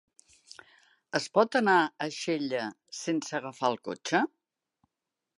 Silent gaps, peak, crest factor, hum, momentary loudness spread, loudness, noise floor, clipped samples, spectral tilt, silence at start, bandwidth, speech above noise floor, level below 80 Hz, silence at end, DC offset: none; -8 dBFS; 22 dB; none; 11 LU; -29 LUFS; -88 dBFS; under 0.1%; -4 dB/octave; 1.15 s; 11.5 kHz; 59 dB; -82 dBFS; 1.1 s; under 0.1%